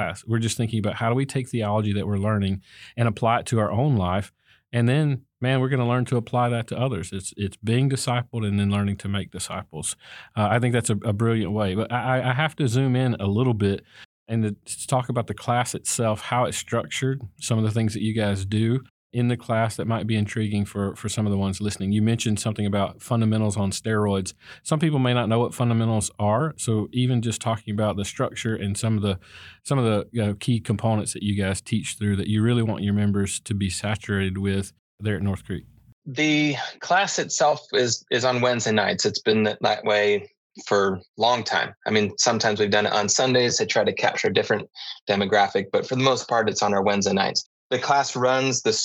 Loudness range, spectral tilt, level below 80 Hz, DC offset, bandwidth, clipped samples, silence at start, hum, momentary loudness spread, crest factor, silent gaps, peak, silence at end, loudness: 4 LU; -5 dB/octave; -60 dBFS; under 0.1%; 15 kHz; under 0.1%; 0 s; none; 7 LU; 18 dB; 14.05-14.26 s, 18.90-19.10 s, 34.79-34.98 s, 35.93-36.02 s, 40.37-40.50 s, 41.09-41.14 s, 45.01-45.07 s, 47.46-47.70 s; -4 dBFS; 0 s; -24 LUFS